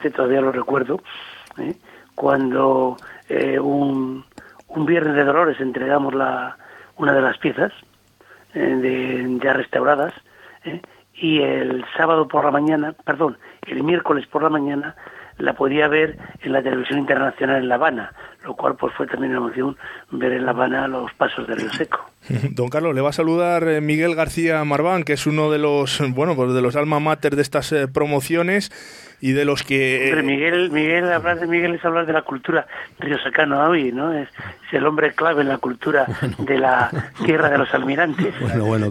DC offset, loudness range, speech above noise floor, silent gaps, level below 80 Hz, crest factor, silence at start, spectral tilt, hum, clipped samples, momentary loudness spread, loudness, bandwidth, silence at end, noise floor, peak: under 0.1%; 3 LU; 31 dB; none; -54 dBFS; 18 dB; 0 s; -6 dB/octave; none; under 0.1%; 12 LU; -19 LUFS; 15.5 kHz; 0 s; -51 dBFS; -2 dBFS